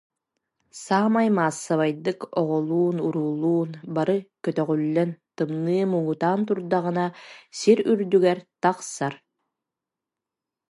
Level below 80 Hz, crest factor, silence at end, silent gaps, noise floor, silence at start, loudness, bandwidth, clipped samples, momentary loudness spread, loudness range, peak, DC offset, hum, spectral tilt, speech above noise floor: -74 dBFS; 20 dB; 1.55 s; none; -87 dBFS; 0.75 s; -24 LUFS; 11.5 kHz; under 0.1%; 9 LU; 2 LU; -4 dBFS; under 0.1%; none; -6.5 dB/octave; 64 dB